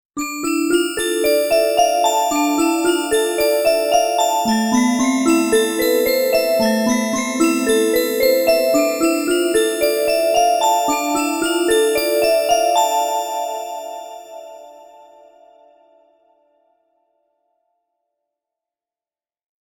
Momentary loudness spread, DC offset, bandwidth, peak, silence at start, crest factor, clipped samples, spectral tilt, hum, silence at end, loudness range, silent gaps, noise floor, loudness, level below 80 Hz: 6 LU; under 0.1%; 19.5 kHz; -2 dBFS; 0.15 s; 16 dB; under 0.1%; -2.5 dB/octave; none; 4.8 s; 5 LU; none; under -90 dBFS; -17 LUFS; -52 dBFS